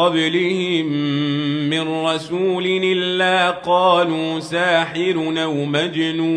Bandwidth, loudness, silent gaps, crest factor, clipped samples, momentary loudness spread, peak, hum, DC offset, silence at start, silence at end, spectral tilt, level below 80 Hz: 10.5 kHz; -18 LUFS; none; 16 dB; under 0.1%; 5 LU; -4 dBFS; none; under 0.1%; 0 s; 0 s; -5.5 dB/octave; -64 dBFS